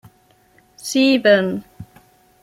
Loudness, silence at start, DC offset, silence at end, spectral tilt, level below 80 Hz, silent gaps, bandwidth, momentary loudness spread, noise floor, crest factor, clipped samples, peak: -16 LUFS; 0.85 s; under 0.1%; 0.6 s; -4.5 dB/octave; -60 dBFS; none; 15 kHz; 17 LU; -55 dBFS; 20 dB; under 0.1%; 0 dBFS